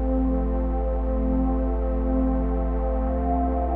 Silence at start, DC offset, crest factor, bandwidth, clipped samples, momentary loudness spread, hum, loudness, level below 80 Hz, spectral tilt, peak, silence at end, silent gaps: 0 s; under 0.1%; 10 dB; 2.8 kHz; under 0.1%; 2 LU; none; -25 LUFS; -26 dBFS; -13 dB/octave; -12 dBFS; 0 s; none